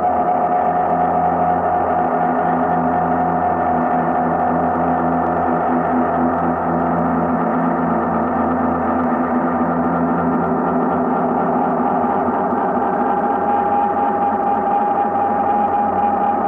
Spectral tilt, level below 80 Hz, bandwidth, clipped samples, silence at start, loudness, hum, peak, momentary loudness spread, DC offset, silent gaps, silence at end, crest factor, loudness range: -10 dB/octave; -46 dBFS; 3.6 kHz; under 0.1%; 0 s; -17 LUFS; none; -6 dBFS; 1 LU; under 0.1%; none; 0 s; 10 dB; 1 LU